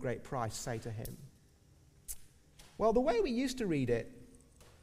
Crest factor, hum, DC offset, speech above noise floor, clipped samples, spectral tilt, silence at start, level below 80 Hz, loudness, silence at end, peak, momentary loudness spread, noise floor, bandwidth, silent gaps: 20 dB; none; under 0.1%; 30 dB; under 0.1%; -5.5 dB/octave; 0 s; -54 dBFS; -35 LUFS; 0.15 s; -18 dBFS; 20 LU; -64 dBFS; 15.5 kHz; none